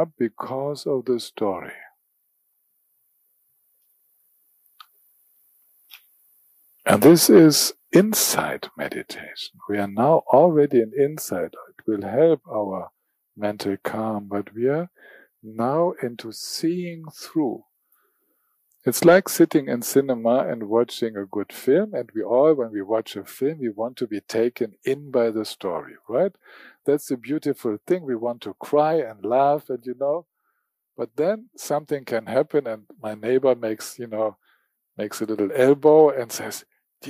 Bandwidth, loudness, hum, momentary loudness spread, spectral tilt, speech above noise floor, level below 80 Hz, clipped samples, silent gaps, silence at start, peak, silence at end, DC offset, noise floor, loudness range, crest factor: 15.5 kHz; -22 LUFS; none; 16 LU; -5 dB/octave; 53 dB; -70 dBFS; under 0.1%; none; 0 s; -4 dBFS; 0 s; under 0.1%; -74 dBFS; 10 LU; 20 dB